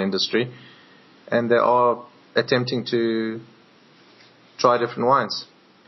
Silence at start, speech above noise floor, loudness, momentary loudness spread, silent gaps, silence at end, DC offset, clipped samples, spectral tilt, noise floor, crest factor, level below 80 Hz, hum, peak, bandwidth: 0 s; 32 dB; -22 LUFS; 12 LU; none; 0.45 s; under 0.1%; under 0.1%; -3.5 dB/octave; -53 dBFS; 20 dB; -78 dBFS; none; -2 dBFS; 6.2 kHz